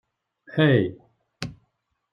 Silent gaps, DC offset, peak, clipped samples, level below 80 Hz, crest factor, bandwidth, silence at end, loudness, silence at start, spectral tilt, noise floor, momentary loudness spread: none; under 0.1%; -6 dBFS; under 0.1%; -60 dBFS; 20 dB; 7.8 kHz; 0.6 s; -22 LUFS; 0.55 s; -7.5 dB/octave; -73 dBFS; 17 LU